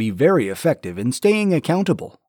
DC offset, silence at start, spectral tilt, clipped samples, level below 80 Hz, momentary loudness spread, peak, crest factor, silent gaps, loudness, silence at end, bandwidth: under 0.1%; 0 s; -6 dB/octave; under 0.1%; -60 dBFS; 6 LU; -4 dBFS; 14 dB; none; -19 LUFS; 0.2 s; over 20 kHz